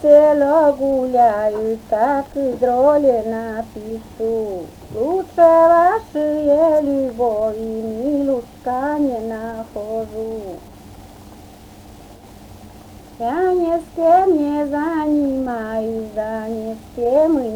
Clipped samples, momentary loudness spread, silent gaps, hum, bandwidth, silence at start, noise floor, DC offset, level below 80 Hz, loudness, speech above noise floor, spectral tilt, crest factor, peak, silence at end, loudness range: under 0.1%; 14 LU; none; none; 20 kHz; 0 s; -40 dBFS; under 0.1%; -46 dBFS; -18 LUFS; 23 dB; -7 dB/octave; 18 dB; 0 dBFS; 0 s; 12 LU